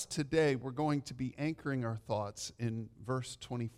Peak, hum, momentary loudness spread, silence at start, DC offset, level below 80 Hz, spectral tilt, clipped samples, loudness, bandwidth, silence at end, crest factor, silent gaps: -18 dBFS; none; 10 LU; 0 s; under 0.1%; -64 dBFS; -5.5 dB/octave; under 0.1%; -37 LUFS; 15 kHz; 0.05 s; 18 dB; none